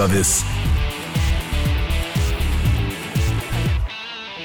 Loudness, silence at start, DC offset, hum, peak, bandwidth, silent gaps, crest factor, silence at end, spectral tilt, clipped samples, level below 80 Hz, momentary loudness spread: -21 LUFS; 0 s; under 0.1%; none; -8 dBFS; over 20 kHz; none; 12 dB; 0 s; -4 dB/octave; under 0.1%; -24 dBFS; 6 LU